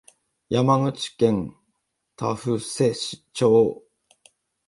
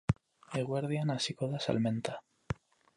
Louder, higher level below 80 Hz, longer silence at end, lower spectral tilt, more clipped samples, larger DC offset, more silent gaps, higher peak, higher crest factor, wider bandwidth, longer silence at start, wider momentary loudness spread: first, -23 LUFS vs -35 LUFS; about the same, -58 dBFS vs -56 dBFS; first, 0.9 s vs 0.45 s; about the same, -6 dB/octave vs -6 dB/octave; neither; neither; neither; first, -4 dBFS vs -14 dBFS; about the same, 20 dB vs 20 dB; about the same, 11.5 kHz vs 11.5 kHz; first, 0.5 s vs 0.1 s; about the same, 12 LU vs 11 LU